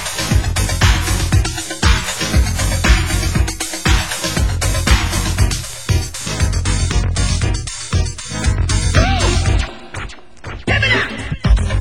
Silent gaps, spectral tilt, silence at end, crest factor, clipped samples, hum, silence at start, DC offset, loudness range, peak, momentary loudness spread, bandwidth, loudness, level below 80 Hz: none; -4 dB/octave; 0 s; 16 dB; under 0.1%; none; 0 s; 2%; 2 LU; 0 dBFS; 8 LU; 16 kHz; -17 LUFS; -18 dBFS